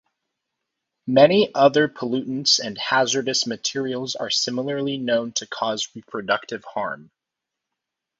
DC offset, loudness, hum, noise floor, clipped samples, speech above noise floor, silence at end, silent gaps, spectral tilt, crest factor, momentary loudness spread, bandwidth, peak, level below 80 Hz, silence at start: under 0.1%; -21 LUFS; none; -84 dBFS; under 0.1%; 63 dB; 1.15 s; none; -3 dB/octave; 22 dB; 12 LU; 7.8 kHz; 0 dBFS; -68 dBFS; 1.05 s